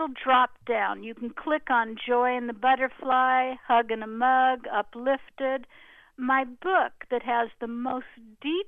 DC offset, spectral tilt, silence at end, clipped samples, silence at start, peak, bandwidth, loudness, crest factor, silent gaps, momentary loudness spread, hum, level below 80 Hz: under 0.1%; -6 dB/octave; 0 s; under 0.1%; 0 s; -10 dBFS; 4 kHz; -26 LUFS; 16 dB; none; 10 LU; none; -64 dBFS